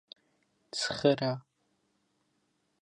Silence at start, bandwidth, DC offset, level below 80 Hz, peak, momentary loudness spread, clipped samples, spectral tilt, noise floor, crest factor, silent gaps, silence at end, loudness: 0.75 s; 11 kHz; under 0.1%; -72 dBFS; -12 dBFS; 12 LU; under 0.1%; -4.5 dB/octave; -76 dBFS; 24 dB; none; 1.45 s; -31 LUFS